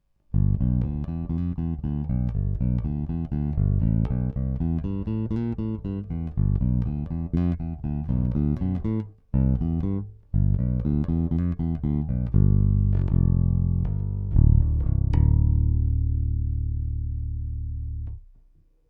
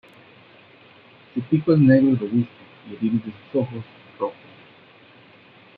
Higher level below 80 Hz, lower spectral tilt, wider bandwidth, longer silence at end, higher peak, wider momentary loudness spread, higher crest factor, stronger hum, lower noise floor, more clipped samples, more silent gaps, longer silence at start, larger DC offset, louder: first, -28 dBFS vs -64 dBFS; about the same, -12.5 dB/octave vs -11.5 dB/octave; second, 3.1 kHz vs 4.7 kHz; second, 0.7 s vs 1.45 s; about the same, -6 dBFS vs -4 dBFS; second, 9 LU vs 17 LU; about the same, 18 dB vs 20 dB; neither; first, -57 dBFS vs -50 dBFS; neither; neither; second, 0.35 s vs 1.35 s; neither; second, -25 LUFS vs -21 LUFS